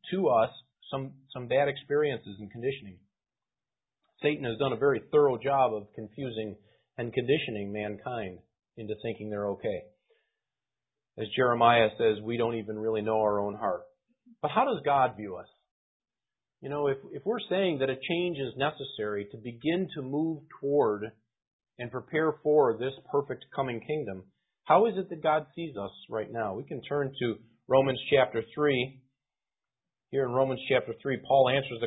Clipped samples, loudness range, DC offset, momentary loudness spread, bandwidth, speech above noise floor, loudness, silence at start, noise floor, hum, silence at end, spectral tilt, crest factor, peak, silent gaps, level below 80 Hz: under 0.1%; 5 LU; under 0.1%; 14 LU; 4 kHz; over 61 dB; -29 LUFS; 0.05 s; under -90 dBFS; none; 0 s; -10 dB/octave; 22 dB; -8 dBFS; 15.71-16.00 s, 21.47-21.59 s; -66 dBFS